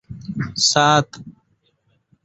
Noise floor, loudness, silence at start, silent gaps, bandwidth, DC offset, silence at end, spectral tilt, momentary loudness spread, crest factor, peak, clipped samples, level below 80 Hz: -65 dBFS; -17 LUFS; 0.1 s; none; 8.2 kHz; under 0.1%; 0.95 s; -3 dB/octave; 17 LU; 20 dB; -2 dBFS; under 0.1%; -54 dBFS